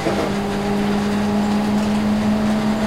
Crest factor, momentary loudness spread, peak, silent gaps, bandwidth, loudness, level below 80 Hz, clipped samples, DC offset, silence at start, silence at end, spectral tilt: 12 dB; 3 LU; -6 dBFS; none; 14.5 kHz; -19 LUFS; -38 dBFS; under 0.1%; under 0.1%; 0 s; 0 s; -6 dB/octave